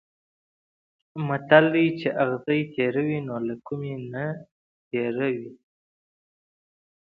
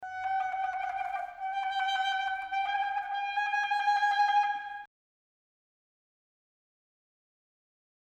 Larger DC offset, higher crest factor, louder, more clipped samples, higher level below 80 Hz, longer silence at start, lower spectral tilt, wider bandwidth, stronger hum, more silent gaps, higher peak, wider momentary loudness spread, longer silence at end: neither; first, 26 dB vs 16 dB; first, -25 LUFS vs -30 LUFS; neither; about the same, -70 dBFS vs -74 dBFS; first, 1.15 s vs 0 s; first, -9.5 dB/octave vs 1 dB/octave; second, 5.2 kHz vs 8.8 kHz; neither; first, 4.52-4.91 s vs none; first, -2 dBFS vs -16 dBFS; first, 15 LU vs 10 LU; second, 1.65 s vs 3.2 s